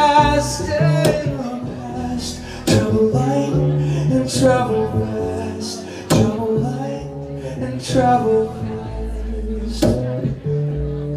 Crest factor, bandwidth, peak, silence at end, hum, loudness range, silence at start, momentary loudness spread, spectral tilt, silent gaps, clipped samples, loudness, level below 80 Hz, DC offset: 16 dB; 15.5 kHz; -2 dBFS; 0 s; none; 3 LU; 0 s; 12 LU; -6 dB/octave; none; under 0.1%; -19 LUFS; -34 dBFS; under 0.1%